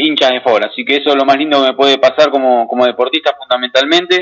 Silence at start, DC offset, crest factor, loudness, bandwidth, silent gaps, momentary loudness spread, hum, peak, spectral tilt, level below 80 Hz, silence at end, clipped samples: 0 s; under 0.1%; 12 dB; -11 LUFS; 7.6 kHz; none; 4 LU; none; 0 dBFS; -3 dB/octave; -62 dBFS; 0 s; under 0.1%